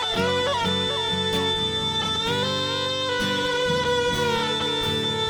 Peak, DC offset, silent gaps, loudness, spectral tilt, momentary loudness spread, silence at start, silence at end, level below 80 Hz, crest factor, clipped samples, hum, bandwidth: -12 dBFS; under 0.1%; none; -23 LUFS; -3.5 dB/octave; 1 LU; 0 s; 0 s; -48 dBFS; 12 dB; under 0.1%; none; over 20 kHz